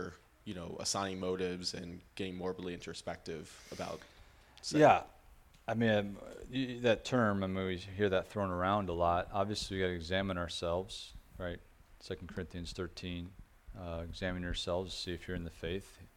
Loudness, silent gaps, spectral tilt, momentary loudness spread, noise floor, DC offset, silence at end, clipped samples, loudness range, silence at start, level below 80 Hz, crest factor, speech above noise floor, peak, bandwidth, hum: -36 LUFS; none; -5 dB/octave; 15 LU; -61 dBFS; under 0.1%; 0.1 s; under 0.1%; 10 LU; 0 s; -56 dBFS; 26 dB; 25 dB; -10 dBFS; 16.5 kHz; none